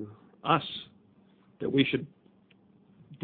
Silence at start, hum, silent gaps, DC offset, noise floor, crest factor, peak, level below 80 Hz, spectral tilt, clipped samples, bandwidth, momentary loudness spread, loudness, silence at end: 0 s; none; none; under 0.1%; -62 dBFS; 24 dB; -8 dBFS; -66 dBFS; -9 dB/octave; under 0.1%; 4.6 kHz; 20 LU; -30 LUFS; 0 s